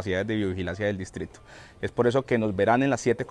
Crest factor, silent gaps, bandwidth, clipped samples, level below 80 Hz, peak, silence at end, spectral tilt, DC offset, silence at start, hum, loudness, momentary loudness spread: 18 dB; none; 11 kHz; under 0.1%; -56 dBFS; -8 dBFS; 0 s; -6 dB/octave; under 0.1%; 0 s; none; -26 LUFS; 13 LU